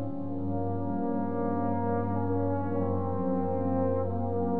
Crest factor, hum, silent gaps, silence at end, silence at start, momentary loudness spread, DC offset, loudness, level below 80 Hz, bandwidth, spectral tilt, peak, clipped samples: 14 dB; none; none; 0 s; 0 s; 3 LU; 1%; -30 LUFS; -62 dBFS; 2.8 kHz; -13.5 dB/octave; -16 dBFS; under 0.1%